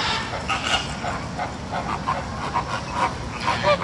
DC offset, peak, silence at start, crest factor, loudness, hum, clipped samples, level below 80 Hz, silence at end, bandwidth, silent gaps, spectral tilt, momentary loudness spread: under 0.1%; -6 dBFS; 0 s; 20 dB; -25 LUFS; none; under 0.1%; -40 dBFS; 0 s; 11.5 kHz; none; -4 dB/octave; 6 LU